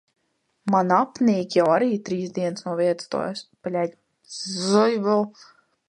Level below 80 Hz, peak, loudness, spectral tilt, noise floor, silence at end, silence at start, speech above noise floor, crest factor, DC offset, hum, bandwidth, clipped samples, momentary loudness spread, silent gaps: -70 dBFS; -6 dBFS; -23 LUFS; -5.5 dB/octave; -71 dBFS; 0.6 s; 0.65 s; 49 dB; 18 dB; under 0.1%; none; 11 kHz; under 0.1%; 12 LU; none